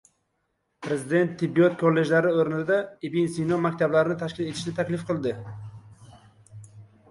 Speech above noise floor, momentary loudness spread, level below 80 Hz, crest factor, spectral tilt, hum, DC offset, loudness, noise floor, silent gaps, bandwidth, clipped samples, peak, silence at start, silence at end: 51 dB; 10 LU; -64 dBFS; 18 dB; -6.5 dB/octave; none; under 0.1%; -25 LUFS; -75 dBFS; none; 11.5 kHz; under 0.1%; -8 dBFS; 0.8 s; 0.25 s